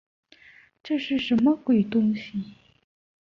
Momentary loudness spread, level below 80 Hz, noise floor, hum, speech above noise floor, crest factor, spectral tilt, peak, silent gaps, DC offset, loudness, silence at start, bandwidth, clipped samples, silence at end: 13 LU; -62 dBFS; -54 dBFS; none; 30 dB; 14 dB; -7.5 dB/octave; -12 dBFS; none; under 0.1%; -24 LUFS; 0.85 s; 6.6 kHz; under 0.1%; 0.7 s